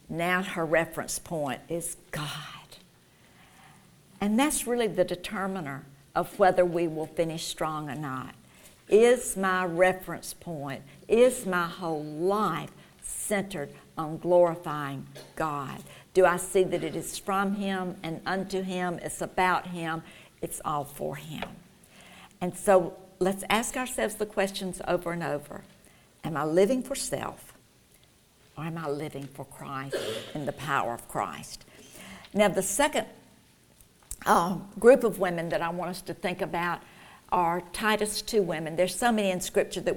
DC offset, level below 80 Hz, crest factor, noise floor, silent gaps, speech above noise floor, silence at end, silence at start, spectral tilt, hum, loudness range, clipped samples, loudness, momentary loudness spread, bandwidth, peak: under 0.1%; -56 dBFS; 24 dB; -60 dBFS; none; 32 dB; 0 s; 0.1 s; -4.5 dB/octave; none; 7 LU; under 0.1%; -28 LUFS; 15 LU; 19 kHz; -6 dBFS